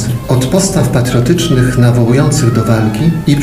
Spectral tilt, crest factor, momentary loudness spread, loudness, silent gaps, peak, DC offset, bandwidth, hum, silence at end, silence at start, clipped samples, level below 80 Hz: -6 dB/octave; 10 dB; 3 LU; -11 LUFS; none; 0 dBFS; 0.4%; 16 kHz; none; 0 s; 0 s; 0.5%; -30 dBFS